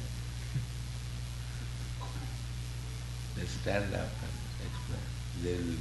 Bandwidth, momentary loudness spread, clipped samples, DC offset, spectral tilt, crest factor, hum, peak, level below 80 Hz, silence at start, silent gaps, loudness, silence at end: 12 kHz; 7 LU; under 0.1%; under 0.1%; -5.5 dB/octave; 20 dB; 60 Hz at -40 dBFS; -18 dBFS; -42 dBFS; 0 s; none; -39 LUFS; 0 s